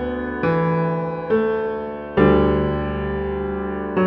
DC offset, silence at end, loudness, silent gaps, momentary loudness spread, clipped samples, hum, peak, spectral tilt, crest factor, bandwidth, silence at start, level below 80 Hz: under 0.1%; 0 s; -21 LUFS; none; 9 LU; under 0.1%; none; -2 dBFS; -10.5 dB/octave; 18 dB; 5.4 kHz; 0 s; -34 dBFS